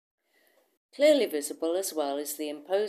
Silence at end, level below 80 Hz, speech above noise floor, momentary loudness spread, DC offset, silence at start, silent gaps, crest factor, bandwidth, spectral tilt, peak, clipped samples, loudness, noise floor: 0 s; under -90 dBFS; 40 dB; 10 LU; under 0.1%; 1 s; none; 18 dB; 15.5 kHz; -2 dB/octave; -10 dBFS; under 0.1%; -28 LUFS; -67 dBFS